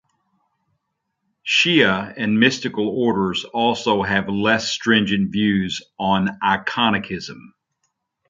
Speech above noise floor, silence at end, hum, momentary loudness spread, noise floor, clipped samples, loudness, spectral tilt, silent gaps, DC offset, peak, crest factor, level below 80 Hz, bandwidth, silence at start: 56 dB; 0.85 s; none; 8 LU; -76 dBFS; under 0.1%; -19 LUFS; -4.5 dB/octave; none; under 0.1%; -2 dBFS; 18 dB; -52 dBFS; 7.6 kHz; 1.45 s